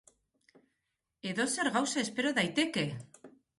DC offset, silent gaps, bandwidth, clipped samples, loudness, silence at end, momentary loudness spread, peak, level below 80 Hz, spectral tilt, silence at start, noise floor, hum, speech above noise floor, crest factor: under 0.1%; none; 11.5 kHz; under 0.1%; -32 LUFS; 0.3 s; 8 LU; -16 dBFS; -74 dBFS; -3.5 dB/octave; 1.25 s; -85 dBFS; none; 53 dB; 18 dB